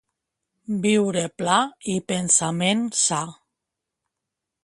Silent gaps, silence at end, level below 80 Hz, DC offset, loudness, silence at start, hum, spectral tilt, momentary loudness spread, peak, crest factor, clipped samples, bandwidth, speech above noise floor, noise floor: none; 1.3 s; -66 dBFS; under 0.1%; -22 LUFS; 0.7 s; none; -3 dB/octave; 10 LU; -4 dBFS; 22 dB; under 0.1%; 11.5 kHz; 62 dB; -84 dBFS